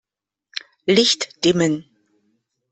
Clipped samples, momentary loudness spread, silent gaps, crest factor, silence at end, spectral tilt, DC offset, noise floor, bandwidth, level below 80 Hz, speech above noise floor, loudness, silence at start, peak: under 0.1%; 17 LU; none; 20 dB; 0.9 s; -4 dB/octave; under 0.1%; -84 dBFS; 8.6 kHz; -60 dBFS; 66 dB; -18 LUFS; 0.85 s; -2 dBFS